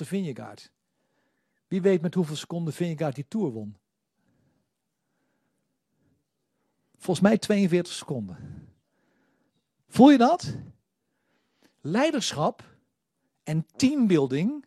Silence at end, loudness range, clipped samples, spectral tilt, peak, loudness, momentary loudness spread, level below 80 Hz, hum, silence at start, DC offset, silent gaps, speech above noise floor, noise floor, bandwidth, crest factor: 0.05 s; 10 LU; under 0.1%; -6 dB/octave; -2 dBFS; -24 LUFS; 20 LU; -66 dBFS; none; 0 s; under 0.1%; none; 56 dB; -80 dBFS; 13 kHz; 24 dB